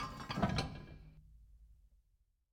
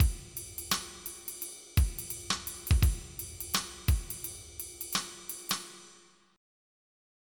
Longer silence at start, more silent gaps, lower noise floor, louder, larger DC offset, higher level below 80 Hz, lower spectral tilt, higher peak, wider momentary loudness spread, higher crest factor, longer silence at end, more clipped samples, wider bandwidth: about the same, 0 s vs 0 s; neither; first, -76 dBFS vs -60 dBFS; second, -39 LUFS vs -34 LUFS; neither; second, -56 dBFS vs -36 dBFS; first, -5.5 dB/octave vs -3 dB/octave; second, -22 dBFS vs -12 dBFS; first, 22 LU vs 11 LU; about the same, 22 dB vs 20 dB; second, 0.8 s vs 1.4 s; neither; about the same, 18.5 kHz vs 19 kHz